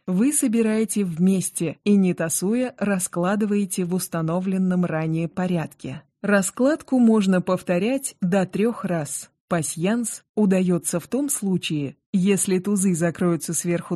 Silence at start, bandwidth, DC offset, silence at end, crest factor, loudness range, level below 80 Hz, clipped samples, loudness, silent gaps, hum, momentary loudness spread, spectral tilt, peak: 0.05 s; 13 kHz; under 0.1%; 0 s; 16 dB; 2 LU; -62 dBFS; under 0.1%; -22 LUFS; 9.40-9.48 s, 10.29-10.34 s, 12.06-12.13 s; none; 7 LU; -5.5 dB/octave; -6 dBFS